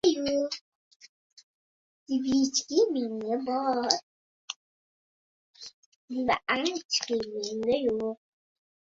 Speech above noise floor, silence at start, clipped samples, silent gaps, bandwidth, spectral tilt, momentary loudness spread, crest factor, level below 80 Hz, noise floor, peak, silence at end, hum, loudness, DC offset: over 62 dB; 0.05 s; under 0.1%; 0.61-1.00 s, 1.09-1.37 s, 1.43-2.06 s, 4.03-4.48 s, 4.56-5.54 s, 5.74-6.08 s, 6.85-6.89 s; 8 kHz; -2.5 dB/octave; 16 LU; 28 dB; -66 dBFS; under -90 dBFS; -2 dBFS; 0.85 s; none; -28 LUFS; under 0.1%